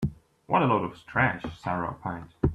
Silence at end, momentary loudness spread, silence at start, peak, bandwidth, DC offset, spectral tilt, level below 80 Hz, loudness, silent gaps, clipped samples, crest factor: 0 s; 11 LU; 0 s; -8 dBFS; 9.2 kHz; under 0.1%; -8 dB/octave; -44 dBFS; -28 LUFS; none; under 0.1%; 20 dB